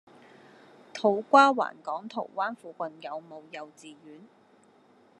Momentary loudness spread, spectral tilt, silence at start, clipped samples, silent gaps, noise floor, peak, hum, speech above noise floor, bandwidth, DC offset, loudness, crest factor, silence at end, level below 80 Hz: 24 LU; -4.5 dB/octave; 0.95 s; under 0.1%; none; -60 dBFS; -6 dBFS; none; 32 dB; 10.5 kHz; under 0.1%; -26 LUFS; 24 dB; 1.05 s; under -90 dBFS